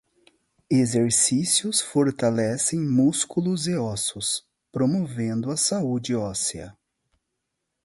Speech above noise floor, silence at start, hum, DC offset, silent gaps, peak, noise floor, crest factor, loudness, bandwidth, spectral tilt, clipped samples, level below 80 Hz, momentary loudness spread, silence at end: 57 dB; 0.7 s; none; under 0.1%; none; -8 dBFS; -80 dBFS; 18 dB; -23 LUFS; 12 kHz; -4 dB/octave; under 0.1%; -58 dBFS; 8 LU; 1.15 s